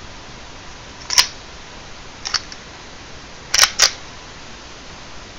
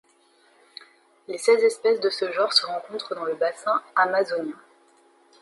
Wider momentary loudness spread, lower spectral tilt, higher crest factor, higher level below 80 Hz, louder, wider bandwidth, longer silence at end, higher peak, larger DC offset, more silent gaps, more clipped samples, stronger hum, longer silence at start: first, 22 LU vs 16 LU; second, 1 dB/octave vs -2 dB/octave; about the same, 24 dB vs 22 dB; first, -44 dBFS vs -82 dBFS; first, -16 LUFS vs -23 LUFS; first, 16 kHz vs 11.5 kHz; second, 0 s vs 0.85 s; first, 0 dBFS vs -4 dBFS; neither; neither; neither; neither; second, 0 s vs 1.3 s